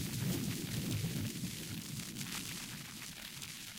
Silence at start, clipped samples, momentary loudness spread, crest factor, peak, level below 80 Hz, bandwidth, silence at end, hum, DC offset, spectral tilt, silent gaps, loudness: 0 s; under 0.1%; 7 LU; 16 dB; -24 dBFS; -60 dBFS; 17 kHz; 0 s; none; under 0.1%; -4 dB/octave; none; -41 LUFS